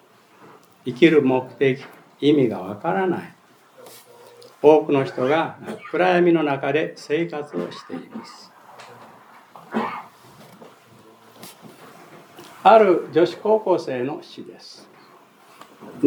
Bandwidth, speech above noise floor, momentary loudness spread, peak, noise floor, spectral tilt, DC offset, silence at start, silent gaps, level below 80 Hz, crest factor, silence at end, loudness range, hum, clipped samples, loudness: 19.5 kHz; 31 dB; 25 LU; 0 dBFS; -50 dBFS; -7 dB/octave; under 0.1%; 0.85 s; none; -80 dBFS; 22 dB; 0 s; 15 LU; none; under 0.1%; -20 LUFS